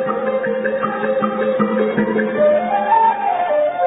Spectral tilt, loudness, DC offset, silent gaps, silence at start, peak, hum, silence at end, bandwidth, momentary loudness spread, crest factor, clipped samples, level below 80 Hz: -11.5 dB/octave; -17 LUFS; under 0.1%; none; 0 s; -4 dBFS; none; 0 s; 4 kHz; 5 LU; 14 dB; under 0.1%; -60 dBFS